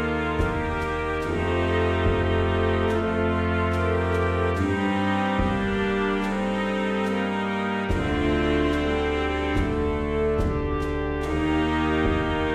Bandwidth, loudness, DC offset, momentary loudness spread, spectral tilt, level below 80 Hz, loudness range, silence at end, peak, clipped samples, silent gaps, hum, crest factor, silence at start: 10.5 kHz; -24 LUFS; under 0.1%; 3 LU; -7 dB/octave; -34 dBFS; 1 LU; 0 s; -10 dBFS; under 0.1%; none; none; 14 dB; 0 s